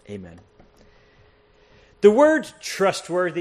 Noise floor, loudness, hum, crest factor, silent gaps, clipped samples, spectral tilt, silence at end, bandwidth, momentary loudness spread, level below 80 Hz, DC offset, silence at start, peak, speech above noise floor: -56 dBFS; -19 LUFS; none; 20 dB; none; under 0.1%; -4.5 dB/octave; 0 s; 13 kHz; 20 LU; -60 dBFS; under 0.1%; 0.1 s; -2 dBFS; 36 dB